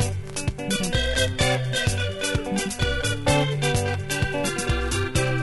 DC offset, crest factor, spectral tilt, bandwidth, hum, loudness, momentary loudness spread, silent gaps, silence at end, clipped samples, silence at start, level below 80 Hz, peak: under 0.1%; 16 dB; -4 dB/octave; 12 kHz; none; -24 LUFS; 5 LU; none; 0 s; under 0.1%; 0 s; -34 dBFS; -6 dBFS